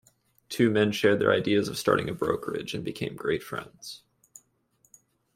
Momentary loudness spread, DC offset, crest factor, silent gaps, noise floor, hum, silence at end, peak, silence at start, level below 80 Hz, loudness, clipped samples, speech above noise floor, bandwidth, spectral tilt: 16 LU; under 0.1%; 22 dB; none; -68 dBFS; none; 1.4 s; -8 dBFS; 0.5 s; -62 dBFS; -27 LUFS; under 0.1%; 42 dB; 16 kHz; -5.5 dB/octave